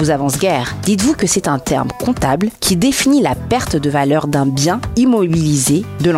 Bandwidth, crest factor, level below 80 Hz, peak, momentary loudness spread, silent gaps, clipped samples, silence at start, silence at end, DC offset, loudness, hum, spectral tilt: 16 kHz; 12 dB; -36 dBFS; -2 dBFS; 4 LU; none; under 0.1%; 0 s; 0 s; under 0.1%; -15 LUFS; none; -5 dB/octave